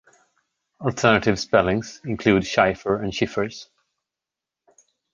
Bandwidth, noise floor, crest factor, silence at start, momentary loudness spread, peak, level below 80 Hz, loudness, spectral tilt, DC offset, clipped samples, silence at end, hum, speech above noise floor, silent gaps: 9.8 kHz; -87 dBFS; 22 dB; 0.8 s; 11 LU; -2 dBFS; -48 dBFS; -21 LUFS; -5.5 dB/octave; under 0.1%; under 0.1%; 1.5 s; none; 66 dB; none